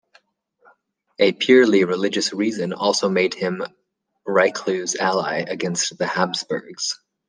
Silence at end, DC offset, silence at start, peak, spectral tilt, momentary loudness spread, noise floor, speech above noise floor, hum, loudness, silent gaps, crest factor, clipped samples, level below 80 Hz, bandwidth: 0.3 s; under 0.1%; 1.2 s; -2 dBFS; -3.5 dB/octave; 11 LU; -61 dBFS; 41 dB; none; -20 LUFS; none; 20 dB; under 0.1%; -70 dBFS; 10 kHz